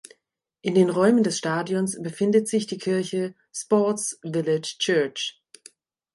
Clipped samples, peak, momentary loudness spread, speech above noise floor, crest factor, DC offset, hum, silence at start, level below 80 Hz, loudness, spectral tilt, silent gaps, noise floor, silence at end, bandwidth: under 0.1%; -6 dBFS; 10 LU; 51 dB; 18 dB; under 0.1%; none; 0.65 s; -72 dBFS; -24 LUFS; -4.5 dB/octave; none; -74 dBFS; 0.85 s; 11.5 kHz